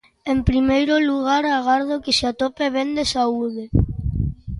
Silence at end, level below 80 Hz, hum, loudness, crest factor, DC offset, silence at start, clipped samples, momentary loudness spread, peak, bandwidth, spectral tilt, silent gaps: 0 s; -32 dBFS; none; -20 LUFS; 16 dB; under 0.1%; 0.25 s; under 0.1%; 7 LU; -4 dBFS; 11.5 kHz; -5.5 dB/octave; none